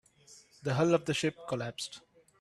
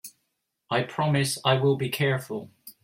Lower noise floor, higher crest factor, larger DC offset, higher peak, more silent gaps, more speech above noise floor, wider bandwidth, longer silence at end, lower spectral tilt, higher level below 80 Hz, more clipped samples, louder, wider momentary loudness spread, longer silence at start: second, -59 dBFS vs -78 dBFS; about the same, 20 dB vs 20 dB; neither; second, -14 dBFS vs -8 dBFS; neither; second, 28 dB vs 53 dB; second, 13 kHz vs 16.5 kHz; first, 0.4 s vs 0.15 s; about the same, -5 dB/octave vs -5 dB/octave; about the same, -70 dBFS vs -66 dBFS; neither; second, -32 LUFS vs -25 LUFS; about the same, 13 LU vs 14 LU; first, 0.3 s vs 0.05 s